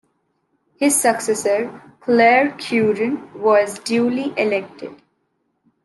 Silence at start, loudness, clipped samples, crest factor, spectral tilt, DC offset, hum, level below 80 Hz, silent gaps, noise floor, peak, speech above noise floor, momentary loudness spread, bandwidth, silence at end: 0.8 s; -18 LUFS; under 0.1%; 18 dB; -3.5 dB/octave; under 0.1%; none; -70 dBFS; none; -69 dBFS; -2 dBFS; 51 dB; 15 LU; 12.5 kHz; 0.9 s